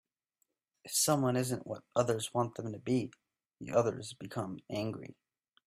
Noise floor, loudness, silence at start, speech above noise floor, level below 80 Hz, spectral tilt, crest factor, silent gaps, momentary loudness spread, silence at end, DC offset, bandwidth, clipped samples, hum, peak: -82 dBFS; -34 LUFS; 0.85 s; 48 dB; -70 dBFS; -4.5 dB/octave; 20 dB; none; 14 LU; 0.55 s; under 0.1%; 15.5 kHz; under 0.1%; none; -16 dBFS